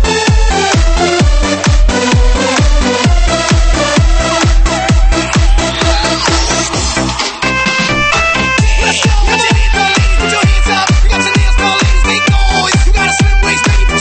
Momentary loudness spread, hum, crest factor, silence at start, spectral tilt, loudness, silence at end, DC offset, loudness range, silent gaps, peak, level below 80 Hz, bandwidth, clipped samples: 2 LU; none; 8 dB; 0 s; -4 dB/octave; -10 LUFS; 0 s; 0.3%; 1 LU; none; 0 dBFS; -12 dBFS; 8.8 kHz; under 0.1%